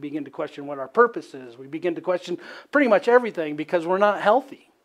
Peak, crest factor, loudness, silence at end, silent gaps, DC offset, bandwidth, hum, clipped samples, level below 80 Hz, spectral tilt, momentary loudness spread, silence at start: -4 dBFS; 20 dB; -22 LUFS; 0.3 s; none; under 0.1%; 11 kHz; none; under 0.1%; -80 dBFS; -6 dB/octave; 15 LU; 0 s